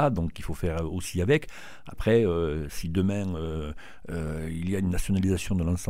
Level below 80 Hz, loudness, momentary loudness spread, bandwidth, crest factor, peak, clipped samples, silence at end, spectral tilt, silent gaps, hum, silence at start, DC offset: -40 dBFS; -28 LUFS; 13 LU; 16 kHz; 18 dB; -10 dBFS; under 0.1%; 0 s; -6.5 dB/octave; none; none; 0 s; 0.8%